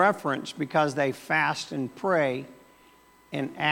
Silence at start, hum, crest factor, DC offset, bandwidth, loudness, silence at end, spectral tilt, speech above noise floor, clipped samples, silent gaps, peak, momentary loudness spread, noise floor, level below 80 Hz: 0 s; none; 20 dB; under 0.1%; 17.5 kHz; -27 LUFS; 0 s; -5 dB/octave; 31 dB; under 0.1%; none; -8 dBFS; 10 LU; -57 dBFS; -72 dBFS